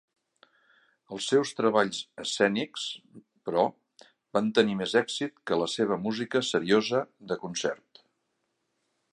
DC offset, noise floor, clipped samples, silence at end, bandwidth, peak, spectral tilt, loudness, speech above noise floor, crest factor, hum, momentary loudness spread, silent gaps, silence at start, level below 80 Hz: under 0.1%; -78 dBFS; under 0.1%; 1.35 s; 11 kHz; -8 dBFS; -4 dB/octave; -28 LUFS; 51 dB; 22 dB; none; 10 LU; none; 1.1 s; -72 dBFS